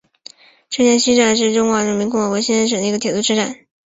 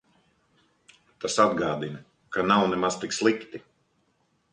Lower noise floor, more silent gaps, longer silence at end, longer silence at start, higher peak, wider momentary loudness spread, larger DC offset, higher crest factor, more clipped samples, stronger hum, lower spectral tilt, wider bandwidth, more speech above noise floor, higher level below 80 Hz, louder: second, -43 dBFS vs -70 dBFS; neither; second, 0.35 s vs 0.95 s; second, 0.7 s vs 1.2 s; first, -2 dBFS vs -6 dBFS; second, 6 LU vs 17 LU; neither; second, 16 dB vs 22 dB; neither; neither; about the same, -3 dB/octave vs -4 dB/octave; second, 8 kHz vs 10.5 kHz; second, 27 dB vs 45 dB; first, -56 dBFS vs -64 dBFS; first, -16 LUFS vs -25 LUFS